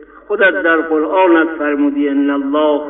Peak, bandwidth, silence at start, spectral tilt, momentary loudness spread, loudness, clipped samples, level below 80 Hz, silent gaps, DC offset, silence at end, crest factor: 0 dBFS; 3.9 kHz; 0 s; -9.5 dB/octave; 4 LU; -14 LUFS; under 0.1%; -54 dBFS; none; under 0.1%; 0 s; 12 dB